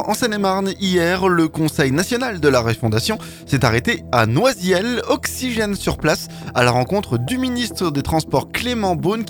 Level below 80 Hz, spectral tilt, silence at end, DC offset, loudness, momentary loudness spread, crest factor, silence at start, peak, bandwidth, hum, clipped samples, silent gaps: -40 dBFS; -5 dB/octave; 0 s; under 0.1%; -18 LUFS; 5 LU; 16 dB; 0 s; -2 dBFS; 19 kHz; none; under 0.1%; none